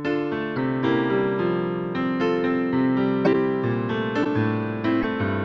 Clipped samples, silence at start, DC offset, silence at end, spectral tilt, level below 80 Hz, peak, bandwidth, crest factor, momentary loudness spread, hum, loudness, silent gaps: under 0.1%; 0 s; under 0.1%; 0 s; -8.5 dB/octave; -54 dBFS; -8 dBFS; 6.4 kHz; 14 dB; 4 LU; none; -23 LUFS; none